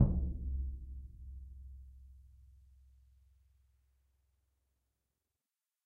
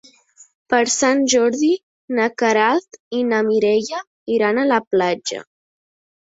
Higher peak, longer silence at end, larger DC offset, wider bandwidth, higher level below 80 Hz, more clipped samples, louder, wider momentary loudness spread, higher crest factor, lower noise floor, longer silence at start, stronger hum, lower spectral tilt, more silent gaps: second, -14 dBFS vs -2 dBFS; first, 3.3 s vs 0.9 s; neither; second, 1.5 kHz vs 8 kHz; first, -44 dBFS vs -64 dBFS; neither; second, -42 LUFS vs -18 LUFS; first, 23 LU vs 10 LU; first, 28 dB vs 18 dB; first, under -90 dBFS vs -50 dBFS; second, 0 s vs 0.7 s; neither; first, -12.5 dB/octave vs -3 dB/octave; second, none vs 1.83-2.08 s, 3.00-3.11 s, 4.07-4.26 s, 4.87-4.91 s